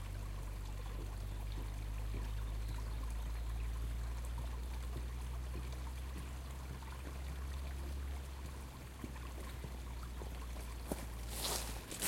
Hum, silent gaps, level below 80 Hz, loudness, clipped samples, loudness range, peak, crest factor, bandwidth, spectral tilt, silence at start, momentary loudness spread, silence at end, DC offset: none; none; -44 dBFS; -45 LUFS; under 0.1%; 3 LU; -24 dBFS; 20 dB; 16.5 kHz; -4 dB/octave; 0 s; 5 LU; 0 s; under 0.1%